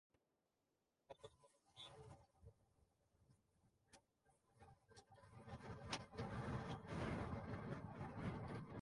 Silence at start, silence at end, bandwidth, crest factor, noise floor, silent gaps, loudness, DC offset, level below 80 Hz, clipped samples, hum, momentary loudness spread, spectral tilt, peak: 1.1 s; 0 s; 11.5 kHz; 22 dB; -89 dBFS; none; -51 LUFS; under 0.1%; -66 dBFS; under 0.1%; none; 18 LU; -6 dB/octave; -32 dBFS